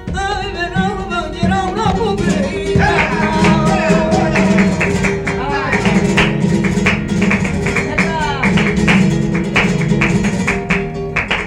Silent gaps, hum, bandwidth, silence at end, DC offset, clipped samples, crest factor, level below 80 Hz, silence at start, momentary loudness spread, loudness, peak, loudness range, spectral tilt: none; none; 11.5 kHz; 0 s; under 0.1%; under 0.1%; 14 dB; -30 dBFS; 0 s; 6 LU; -14 LUFS; -2 dBFS; 1 LU; -6 dB/octave